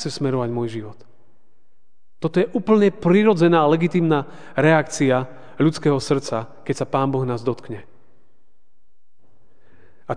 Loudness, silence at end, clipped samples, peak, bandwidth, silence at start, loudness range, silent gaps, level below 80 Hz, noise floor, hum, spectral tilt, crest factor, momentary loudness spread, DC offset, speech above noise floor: -20 LUFS; 0 s; under 0.1%; -2 dBFS; 10 kHz; 0 s; 10 LU; none; -60 dBFS; -69 dBFS; none; -6.5 dB/octave; 18 dB; 14 LU; 1%; 50 dB